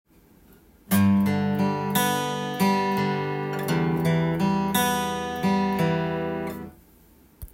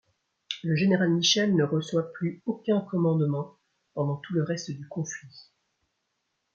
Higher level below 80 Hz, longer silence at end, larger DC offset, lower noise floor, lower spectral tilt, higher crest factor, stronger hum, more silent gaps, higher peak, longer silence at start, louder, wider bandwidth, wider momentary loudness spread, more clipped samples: first, -54 dBFS vs -72 dBFS; second, 0.05 s vs 1.15 s; neither; second, -55 dBFS vs -79 dBFS; about the same, -5.5 dB/octave vs -5 dB/octave; about the same, 16 dB vs 18 dB; neither; neither; about the same, -10 dBFS vs -10 dBFS; first, 0.9 s vs 0.5 s; first, -24 LUFS vs -27 LUFS; first, 16.5 kHz vs 7.4 kHz; second, 6 LU vs 14 LU; neither